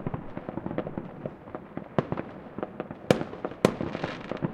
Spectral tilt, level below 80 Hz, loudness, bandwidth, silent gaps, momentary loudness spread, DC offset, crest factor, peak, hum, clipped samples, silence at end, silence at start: -6.5 dB/octave; -54 dBFS; -32 LUFS; 16 kHz; none; 13 LU; under 0.1%; 28 dB; -2 dBFS; none; under 0.1%; 0 s; 0 s